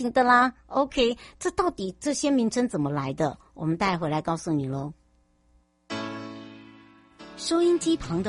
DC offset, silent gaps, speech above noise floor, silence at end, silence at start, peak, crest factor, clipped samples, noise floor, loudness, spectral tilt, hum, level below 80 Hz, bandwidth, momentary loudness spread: under 0.1%; none; 39 dB; 0 s; 0 s; -8 dBFS; 18 dB; under 0.1%; -64 dBFS; -26 LUFS; -5 dB/octave; none; -52 dBFS; 11.5 kHz; 15 LU